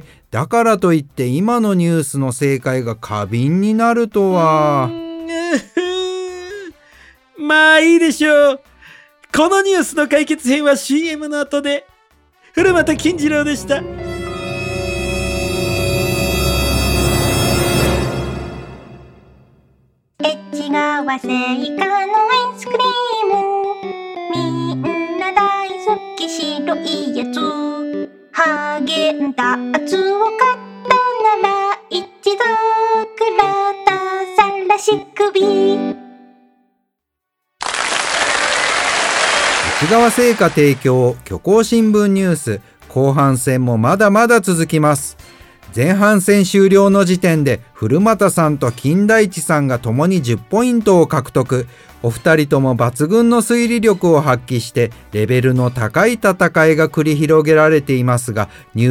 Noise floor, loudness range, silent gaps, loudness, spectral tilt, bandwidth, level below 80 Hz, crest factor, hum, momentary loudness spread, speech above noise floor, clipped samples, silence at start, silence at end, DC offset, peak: -77 dBFS; 6 LU; none; -15 LUFS; -5 dB/octave; 17.5 kHz; -36 dBFS; 16 dB; none; 10 LU; 63 dB; under 0.1%; 0.35 s; 0 s; under 0.1%; 0 dBFS